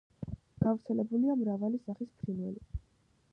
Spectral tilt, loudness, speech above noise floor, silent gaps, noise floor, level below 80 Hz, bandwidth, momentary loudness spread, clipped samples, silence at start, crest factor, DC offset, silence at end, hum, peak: -11.5 dB/octave; -34 LUFS; 37 dB; none; -70 dBFS; -52 dBFS; 5.4 kHz; 15 LU; under 0.1%; 0.2 s; 20 dB; under 0.1%; 0.55 s; none; -14 dBFS